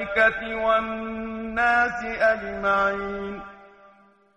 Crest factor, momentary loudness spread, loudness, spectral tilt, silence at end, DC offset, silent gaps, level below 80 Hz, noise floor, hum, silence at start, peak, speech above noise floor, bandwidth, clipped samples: 16 dB; 12 LU; -23 LUFS; -5 dB/octave; 0.7 s; under 0.1%; none; -50 dBFS; -56 dBFS; none; 0 s; -8 dBFS; 32 dB; 8.8 kHz; under 0.1%